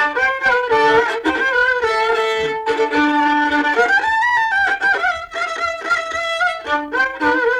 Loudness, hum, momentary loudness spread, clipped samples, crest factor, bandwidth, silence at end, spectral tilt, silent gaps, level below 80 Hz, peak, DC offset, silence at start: -16 LUFS; none; 6 LU; under 0.1%; 12 dB; 12.5 kHz; 0 s; -3 dB/octave; none; -50 dBFS; -4 dBFS; under 0.1%; 0 s